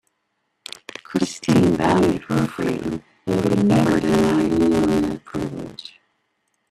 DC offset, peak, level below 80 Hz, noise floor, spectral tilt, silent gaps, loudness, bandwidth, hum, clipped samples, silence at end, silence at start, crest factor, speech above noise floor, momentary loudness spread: under 0.1%; -2 dBFS; -46 dBFS; -73 dBFS; -6.5 dB/octave; none; -20 LUFS; 13.5 kHz; none; under 0.1%; 0.85 s; 1.1 s; 18 dB; 54 dB; 18 LU